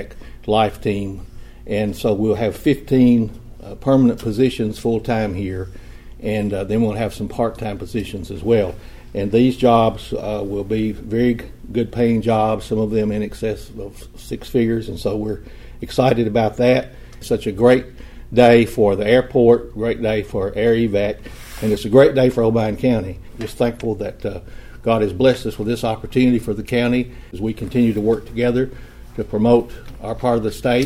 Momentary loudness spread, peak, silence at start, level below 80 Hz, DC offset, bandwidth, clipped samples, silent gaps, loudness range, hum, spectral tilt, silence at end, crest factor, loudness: 16 LU; 0 dBFS; 0 s; -38 dBFS; under 0.1%; 16 kHz; under 0.1%; none; 6 LU; none; -7 dB/octave; 0 s; 18 dB; -18 LUFS